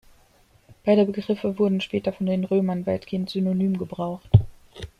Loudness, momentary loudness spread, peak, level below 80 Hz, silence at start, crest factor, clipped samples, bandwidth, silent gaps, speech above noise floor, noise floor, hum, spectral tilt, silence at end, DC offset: -24 LUFS; 9 LU; -2 dBFS; -46 dBFS; 0.85 s; 22 dB; under 0.1%; 9.6 kHz; none; 36 dB; -58 dBFS; none; -9 dB/octave; 0.15 s; under 0.1%